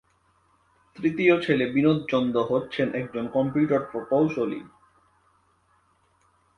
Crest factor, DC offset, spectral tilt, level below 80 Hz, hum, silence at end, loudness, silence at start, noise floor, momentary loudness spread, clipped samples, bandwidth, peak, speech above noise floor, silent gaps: 20 dB; under 0.1%; -8 dB/octave; -62 dBFS; none; 1.9 s; -24 LUFS; 0.95 s; -65 dBFS; 8 LU; under 0.1%; 9.4 kHz; -6 dBFS; 41 dB; none